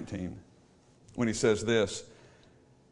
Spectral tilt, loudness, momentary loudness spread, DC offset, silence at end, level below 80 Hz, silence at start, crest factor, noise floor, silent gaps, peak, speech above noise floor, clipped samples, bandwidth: -4.5 dB/octave; -30 LUFS; 17 LU; under 0.1%; 0.8 s; -60 dBFS; 0 s; 20 dB; -61 dBFS; none; -14 dBFS; 31 dB; under 0.1%; 11 kHz